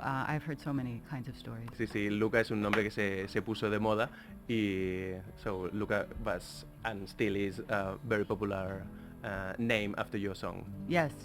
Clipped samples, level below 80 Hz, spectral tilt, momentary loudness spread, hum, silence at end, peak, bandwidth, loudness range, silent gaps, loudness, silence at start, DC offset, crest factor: under 0.1%; -54 dBFS; -6.5 dB/octave; 11 LU; none; 0 s; -10 dBFS; 16.5 kHz; 4 LU; none; -35 LUFS; 0 s; under 0.1%; 24 dB